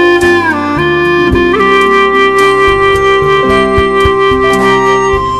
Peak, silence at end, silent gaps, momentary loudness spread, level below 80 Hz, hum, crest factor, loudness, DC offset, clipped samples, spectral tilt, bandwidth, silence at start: 0 dBFS; 0 s; none; 3 LU; -26 dBFS; none; 8 dB; -8 LUFS; 1%; 0.6%; -5 dB/octave; 13 kHz; 0 s